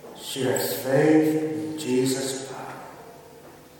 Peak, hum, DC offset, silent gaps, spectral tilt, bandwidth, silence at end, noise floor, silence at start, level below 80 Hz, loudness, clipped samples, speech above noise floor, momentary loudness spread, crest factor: -8 dBFS; none; under 0.1%; none; -5 dB/octave; 17.5 kHz; 0.2 s; -47 dBFS; 0 s; -68 dBFS; -24 LUFS; under 0.1%; 24 dB; 19 LU; 18 dB